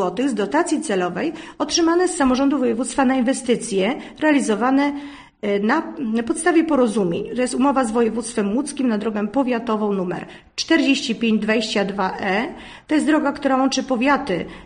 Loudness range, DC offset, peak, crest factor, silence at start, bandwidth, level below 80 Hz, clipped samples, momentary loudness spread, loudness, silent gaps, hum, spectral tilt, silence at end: 2 LU; under 0.1%; -4 dBFS; 16 dB; 0 s; 10 kHz; -52 dBFS; under 0.1%; 7 LU; -20 LUFS; none; none; -4.5 dB/octave; 0 s